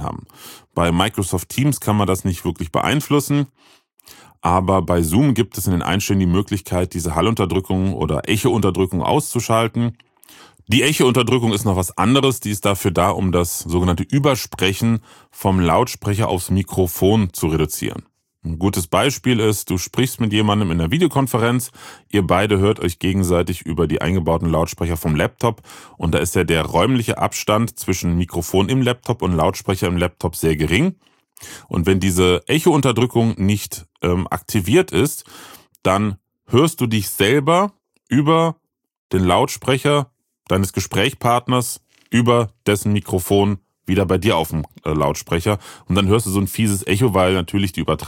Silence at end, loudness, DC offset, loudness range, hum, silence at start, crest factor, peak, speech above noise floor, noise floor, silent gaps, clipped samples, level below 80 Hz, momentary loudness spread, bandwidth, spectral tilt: 0 s; -18 LUFS; under 0.1%; 2 LU; none; 0 s; 18 dB; -2 dBFS; 29 dB; -47 dBFS; 38.98-39.10 s; under 0.1%; -40 dBFS; 7 LU; 17 kHz; -5.5 dB/octave